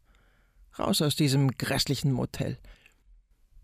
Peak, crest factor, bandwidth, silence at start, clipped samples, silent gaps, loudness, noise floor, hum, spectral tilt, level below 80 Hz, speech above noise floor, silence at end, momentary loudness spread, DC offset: -14 dBFS; 16 dB; 16 kHz; 0.75 s; under 0.1%; none; -27 LUFS; -62 dBFS; none; -5 dB/octave; -52 dBFS; 35 dB; 0.9 s; 11 LU; under 0.1%